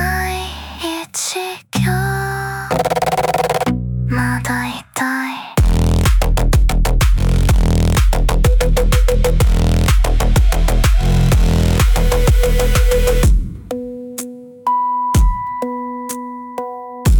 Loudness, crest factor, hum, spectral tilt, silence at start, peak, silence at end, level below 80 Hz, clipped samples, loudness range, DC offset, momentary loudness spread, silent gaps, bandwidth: -17 LUFS; 12 dB; none; -5.5 dB/octave; 0 s; -2 dBFS; 0 s; -16 dBFS; under 0.1%; 4 LU; under 0.1%; 11 LU; none; 18.5 kHz